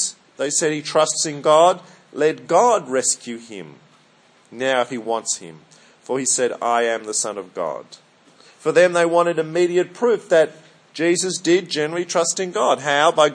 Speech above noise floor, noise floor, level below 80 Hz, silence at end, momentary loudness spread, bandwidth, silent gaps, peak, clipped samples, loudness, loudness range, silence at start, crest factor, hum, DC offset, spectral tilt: 35 dB; -54 dBFS; -78 dBFS; 0 s; 12 LU; 10.5 kHz; none; -2 dBFS; under 0.1%; -19 LUFS; 5 LU; 0 s; 18 dB; none; under 0.1%; -2.5 dB/octave